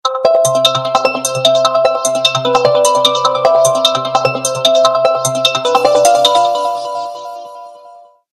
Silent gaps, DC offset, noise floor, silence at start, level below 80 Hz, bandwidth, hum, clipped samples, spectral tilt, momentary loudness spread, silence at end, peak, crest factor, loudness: none; under 0.1%; -40 dBFS; 0.05 s; -56 dBFS; 14.5 kHz; none; under 0.1%; -2 dB/octave; 9 LU; 0.35 s; 0 dBFS; 12 dB; -11 LUFS